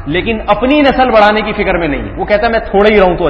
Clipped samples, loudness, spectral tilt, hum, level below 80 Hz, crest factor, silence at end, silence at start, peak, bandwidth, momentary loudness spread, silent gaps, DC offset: 0.3%; -10 LUFS; -7.5 dB/octave; none; -26 dBFS; 10 dB; 0 s; 0 s; 0 dBFS; 8 kHz; 7 LU; none; under 0.1%